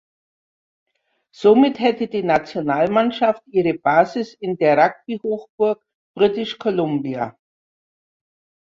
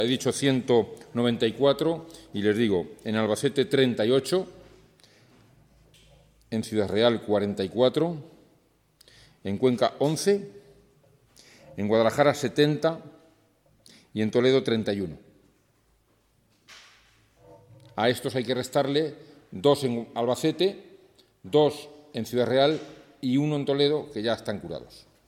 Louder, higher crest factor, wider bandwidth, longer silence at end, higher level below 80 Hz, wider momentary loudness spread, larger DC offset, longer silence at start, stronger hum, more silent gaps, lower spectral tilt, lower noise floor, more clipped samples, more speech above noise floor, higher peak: first, -19 LUFS vs -25 LUFS; about the same, 18 dB vs 20 dB; second, 7.4 kHz vs 16 kHz; first, 1.3 s vs 0.3 s; about the same, -60 dBFS vs -64 dBFS; about the same, 11 LU vs 13 LU; neither; first, 1.4 s vs 0 s; neither; first, 5.49-5.58 s, 5.95-6.14 s vs none; first, -7 dB/octave vs -5.5 dB/octave; first, under -90 dBFS vs -66 dBFS; neither; first, over 72 dB vs 41 dB; first, -2 dBFS vs -8 dBFS